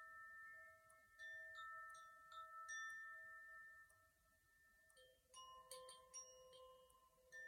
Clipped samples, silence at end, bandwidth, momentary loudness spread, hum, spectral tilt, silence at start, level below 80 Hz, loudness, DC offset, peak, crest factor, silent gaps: under 0.1%; 0 s; 16.5 kHz; 13 LU; none; 1 dB/octave; 0 s; -88 dBFS; -58 LUFS; under 0.1%; -42 dBFS; 20 dB; none